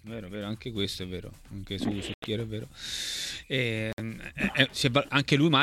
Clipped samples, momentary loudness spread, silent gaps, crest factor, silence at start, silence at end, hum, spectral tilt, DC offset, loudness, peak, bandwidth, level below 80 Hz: under 0.1%; 14 LU; 2.14-2.22 s, 3.93-3.97 s; 26 dB; 0.05 s; 0 s; none; -4.5 dB/octave; under 0.1%; -29 LUFS; -4 dBFS; 16 kHz; -52 dBFS